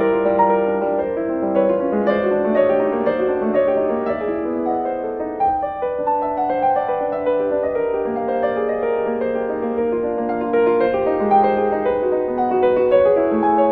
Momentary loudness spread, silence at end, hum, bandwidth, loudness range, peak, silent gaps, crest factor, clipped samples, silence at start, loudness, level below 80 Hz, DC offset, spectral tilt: 6 LU; 0 s; none; 4.6 kHz; 3 LU; -4 dBFS; none; 14 dB; under 0.1%; 0 s; -19 LUFS; -50 dBFS; under 0.1%; -9.5 dB/octave